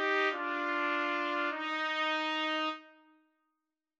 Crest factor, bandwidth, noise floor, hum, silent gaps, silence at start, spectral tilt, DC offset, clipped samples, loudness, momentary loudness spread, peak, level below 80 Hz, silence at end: 18 dB; 8.2 kHz; -87 dBFS; none; none; 0 s; -1 dB/octave; under 0.1%; under 0.1%; -32 LUFS; 4 LU; -16 dBFS; under -90 dBFS; 1.1 s